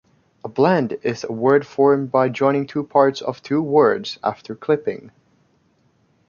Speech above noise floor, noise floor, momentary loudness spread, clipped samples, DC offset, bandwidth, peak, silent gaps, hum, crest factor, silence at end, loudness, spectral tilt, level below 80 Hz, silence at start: 42 dB; -61 dBFS; 12 LU; under 0.1%; under 0.1%; 7.2 kHz; -2 dBFS; none; none; 18 dB; 1.2 s; -19 LUFS; -7 dB/octave; -64 dBFS; 0.45 s